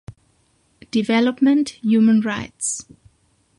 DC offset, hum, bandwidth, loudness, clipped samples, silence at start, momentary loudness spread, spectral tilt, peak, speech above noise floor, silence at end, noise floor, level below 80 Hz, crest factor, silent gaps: under 0.1%; none; 11.5 kHz; -19 LUFS; under 0.1%; 0.1 s; 9 LU; -4.5 dB/octave; -6 dBFS; 44 dB; 0.75 s; -62 dBFS; -56 dBFS; 14 dB; none